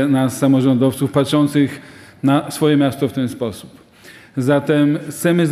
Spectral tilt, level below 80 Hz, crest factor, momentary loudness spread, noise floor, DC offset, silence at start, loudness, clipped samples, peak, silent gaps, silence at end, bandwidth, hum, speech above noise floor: -6.5 dB/octave; -58 dBFS; 14 dB; 9 LU; -43 dBFS; under 0.1%; 0 s; -17 LUFS; under 0.1%; -2 dBFS; none; 0 s; 15 kHz; none; 27 dB